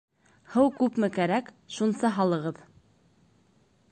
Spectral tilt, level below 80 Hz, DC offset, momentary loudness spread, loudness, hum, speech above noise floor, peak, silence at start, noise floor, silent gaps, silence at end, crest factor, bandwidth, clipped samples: -6.5 dB/octave; -68 dBFS; under 0.1%; 11 LU; -27 LUFS; none; 38 dB; -10 dBFS; 0.5 s; -64 dBFS; none; 1.4 s; 18 dB; 9 kHz; under 0.1%